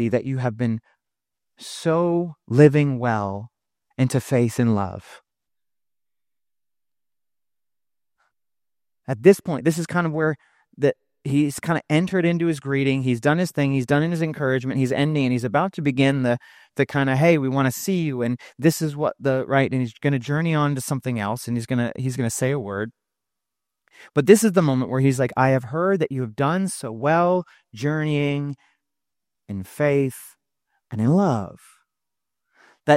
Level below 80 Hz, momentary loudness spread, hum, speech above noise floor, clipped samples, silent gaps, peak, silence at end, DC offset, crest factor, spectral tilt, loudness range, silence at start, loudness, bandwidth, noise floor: -62 dBFS; 11 LU; none; over 69 dB; under 0.1%; none; 0 dBFS; 0 s; under 0.1%; 22 dB; -6.5 dB/octave; 5 LU; 0 s; -22 LUFS; 16 kHz; under -90 dBFS